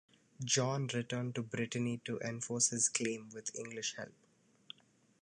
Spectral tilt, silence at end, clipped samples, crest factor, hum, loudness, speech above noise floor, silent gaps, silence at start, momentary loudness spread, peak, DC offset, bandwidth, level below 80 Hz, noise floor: -3 dB/octave; 1.1 s; under 0.1%; 22 dB; none; -36 LUFS; 32 dB; none; 0.4 s; 18 LU; -16 dBFS; under 0.1%; 11 kHz; -80 dBFS; -70 dBFS